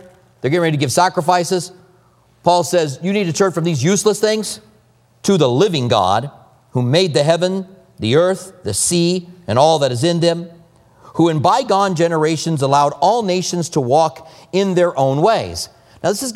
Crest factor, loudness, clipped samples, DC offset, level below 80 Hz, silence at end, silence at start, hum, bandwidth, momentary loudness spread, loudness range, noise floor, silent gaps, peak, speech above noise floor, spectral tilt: 16 dB; -16 LUFS; under 0.1%; under 0.1%; -54 dBFS; 0 s; 0.45 s; none; 16 kHz; 10 LU; 1 LU; -53 dBFS; none; 0 dBFS; 38 dB; -5 dB/octave